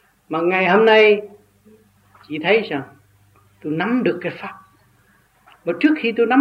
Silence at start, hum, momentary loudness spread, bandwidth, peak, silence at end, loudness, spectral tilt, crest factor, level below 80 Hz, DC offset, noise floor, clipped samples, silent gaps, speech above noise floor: 0.3 s; 50 Hz at -55 dBFS; 18 LU; 6.2 kHz; -2 dBFS; 0 s; -17 LUFS; -7 dB/octave; 16 dB; -68 dBFS; under 0.1%; -57 dBFS; under 0.1%; none; 40 dB